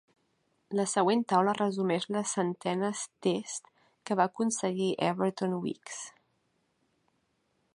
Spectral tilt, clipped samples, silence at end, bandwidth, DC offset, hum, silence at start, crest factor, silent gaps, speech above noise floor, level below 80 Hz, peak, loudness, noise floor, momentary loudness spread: -4.5 dB/octave; under 0.1%; 1.65 s; 11.5 kHz; under 0.1%; none; 0.7 s; 20 dB; none; 45 dB; -80 dBFS; -12 dBFS; -30 LUFS; -75 dBFS; 13 LU